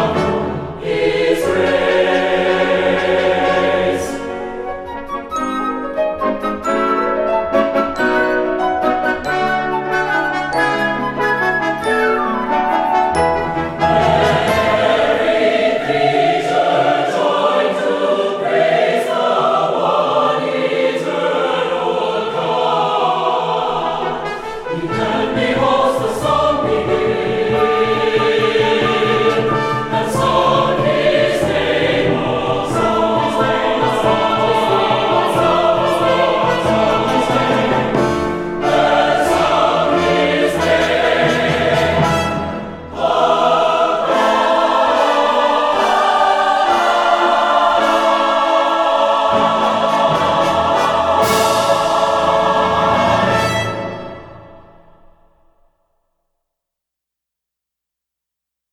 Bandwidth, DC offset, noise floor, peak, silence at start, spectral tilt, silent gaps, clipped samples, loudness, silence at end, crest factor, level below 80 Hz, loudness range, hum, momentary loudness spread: 17.5 kHz; under 0.1%; -83 dBFS; -2 dBFS; 0 s; -5 dB/octave; none; under 0.1%; -15 LUFS; 4.15 s; 14 dB; -42 dBFS; 4 LU; none; 5 LU